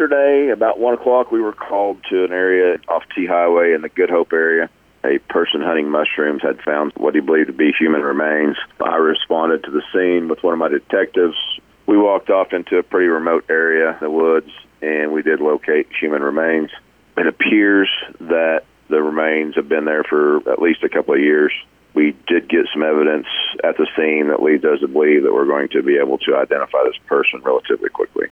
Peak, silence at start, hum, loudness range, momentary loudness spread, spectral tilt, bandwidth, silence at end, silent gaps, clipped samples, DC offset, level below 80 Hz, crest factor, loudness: -4 dBFS; 0 s; none; 2 LU; 6 LU; -6.5 dB/octave; 3.8 kHz; 0.15 s; none; under 0.1%; under 0.1%; -60 dBFS; 12 dB; -16 LUFS